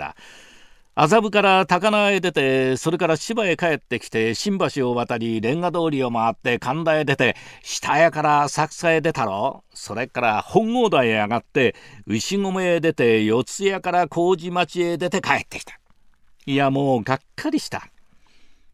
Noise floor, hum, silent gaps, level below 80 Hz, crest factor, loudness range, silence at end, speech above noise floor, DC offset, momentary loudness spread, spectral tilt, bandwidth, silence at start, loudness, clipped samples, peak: -53 dBFS; none; none; -58 dBFS; 20 dB; 4 LU; 0.2 s; 32 dB; under 0.1%; 10 LU; -5 dB/octave; 15 kHz; 0 s; -20 LUFS; under 0.1%; 0 dBFS